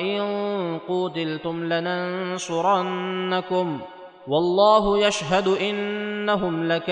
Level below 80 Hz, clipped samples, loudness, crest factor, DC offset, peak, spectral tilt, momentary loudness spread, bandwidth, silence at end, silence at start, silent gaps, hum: -52 dBFS; under 0.1%; -23 LUFS; 18 dB; under 0.1%; -6 dBFS; -5 dB/octave; 10 LU; 10 kHz; 0 s; 0 s; none; none